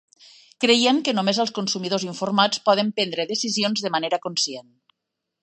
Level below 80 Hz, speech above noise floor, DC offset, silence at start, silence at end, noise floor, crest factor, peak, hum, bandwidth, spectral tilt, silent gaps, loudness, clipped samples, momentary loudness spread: -74 dBFS; 60 dB; under 0.1%; 0.6 s; 0.8 s; -82 dBFS; 20 dB; -4 dBFS; none; 11 kHz; -3 dB/octave; none; -21 LUFS; under 0.1%; 7 LU